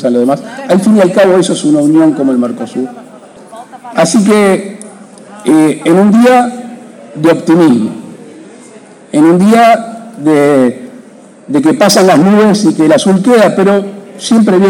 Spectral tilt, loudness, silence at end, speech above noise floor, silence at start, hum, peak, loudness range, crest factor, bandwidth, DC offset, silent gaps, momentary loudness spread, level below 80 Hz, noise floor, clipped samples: -5.5 dB/octave; -8 LUFS; 0 s; 28 dB; 0 s; none; 0 dBFS; 3 LU; 8 dB; 16.5 kHz; under 0.1%; none; 14 LU; -58 dBFS; -35 dBFS; under 0.1%